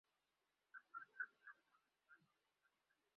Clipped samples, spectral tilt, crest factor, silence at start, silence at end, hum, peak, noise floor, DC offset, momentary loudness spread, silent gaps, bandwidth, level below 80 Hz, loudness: under 0.1%; 1 dB/octave; 24 dB; 0.75 s; 1 s; none; -38 dBFS; -90 dBFS; under 0.1%; 13 LU; none; 5 kHz; under -90 dBFS; -57 LUFS